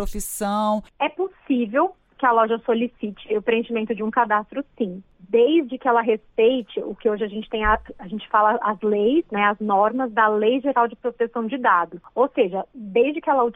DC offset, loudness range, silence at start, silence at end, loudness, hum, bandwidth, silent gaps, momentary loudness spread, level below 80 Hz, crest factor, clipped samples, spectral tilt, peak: under 0.1%; 2 LU; 0 s; 0.05 s; -22 LUFS; none; 16 kHz; none; 9 LU; -44 dBFS; 16 dB; under 0.1%; -5 dB/octave; -4 dBFS